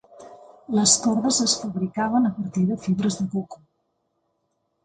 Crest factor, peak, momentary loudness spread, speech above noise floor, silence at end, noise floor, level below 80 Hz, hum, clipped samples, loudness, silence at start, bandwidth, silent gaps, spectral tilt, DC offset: 22 dB; -4 dBFS; 10 LU; 51 dB; 1.3 s; -74 dBFS; -60 dBFS; none; under 0.1%; -22 LUFS; 0.2 s; 9.6 kHz; none; -3.5 dB/octave; under 0.1%